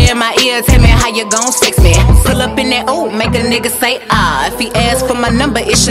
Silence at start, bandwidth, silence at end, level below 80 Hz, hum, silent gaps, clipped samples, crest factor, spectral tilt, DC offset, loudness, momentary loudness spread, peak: 0 s; 16 kHz; 0 s; -16 dBFS; none; none; 0.9%; 10 dB; -4 dB/octave; under 0.1%; -11 LUFS; 5 LU; 0 dBFS